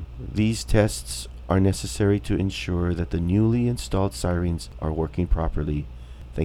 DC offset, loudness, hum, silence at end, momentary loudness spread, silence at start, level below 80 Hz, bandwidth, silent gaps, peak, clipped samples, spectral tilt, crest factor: under 0.1%; -25 LUFS; none; 0 s; 9 LU; 0 s; -32 dBFS; 16 kHz; none; -4 dBFS; under 0.1%; -6.5 dB/octave; 20 dB